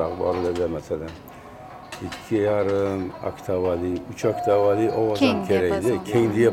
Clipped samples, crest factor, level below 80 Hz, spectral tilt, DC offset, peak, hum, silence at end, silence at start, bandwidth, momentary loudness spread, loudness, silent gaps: under 0.1%; 16 dB; -50 dBFS; -6.5 dB/octave; under 0.1%; -6 dBFS; none; 0 s; 0 s; 16 kHz; 17 LU; -23 LUFS; none